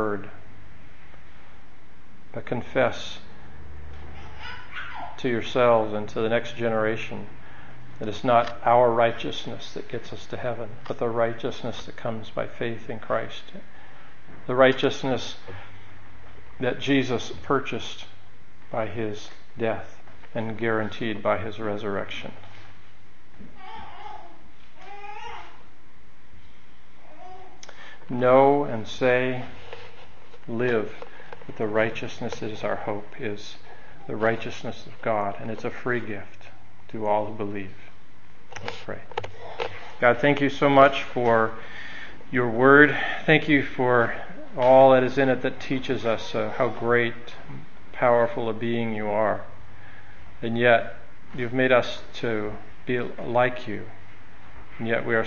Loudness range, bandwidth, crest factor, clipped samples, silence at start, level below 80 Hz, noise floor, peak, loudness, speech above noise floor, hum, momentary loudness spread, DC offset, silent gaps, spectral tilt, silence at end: 12 LU; 7.2 kHz; 26 dB; under 0.1%; 0 s; -56 dBFS; -55 dBFS; 0 dBFS; -24 LUFS; 31 dB; none; 23 LU; 3%; none; -6 dB/octave; 0 s